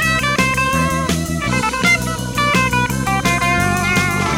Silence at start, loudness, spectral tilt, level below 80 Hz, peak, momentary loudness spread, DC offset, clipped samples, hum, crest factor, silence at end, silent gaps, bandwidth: 0 s; -16 LUFS; -4 dB/octave; -32 dBFS; -2 dBFS; 4 LU; under 0.1%; under 0.1%; none; 14 dB; 0 s; none; 16.5 kHz